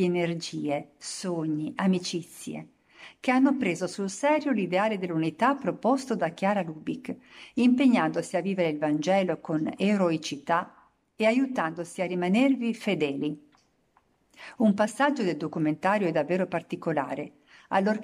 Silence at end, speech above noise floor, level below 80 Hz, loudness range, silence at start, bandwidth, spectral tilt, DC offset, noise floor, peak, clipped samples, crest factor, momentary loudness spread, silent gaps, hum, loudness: 0 s; 41 dB; -74 dBFS; 3 LU; 0 s; 13 kHz; -6 dB/octave; under 0.1%; -67 dBFS; -10 dBFS; under 0.1%; 16 dB; 12 LU; none; none; -27 LUFS